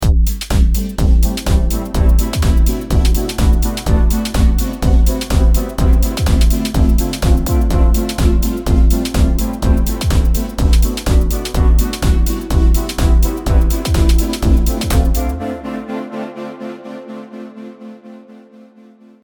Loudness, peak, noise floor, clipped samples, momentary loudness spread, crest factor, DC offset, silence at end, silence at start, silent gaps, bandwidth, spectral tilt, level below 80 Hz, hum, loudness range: -15 LUFS; 0 dBFS; -43 dBFS; under 0.1%; 12 LU; 12 dB; under 0.1%; 0.9 s; 0 s; none; 20 kHz; -6 dB/octave; -14 dBFS; none; 6 LU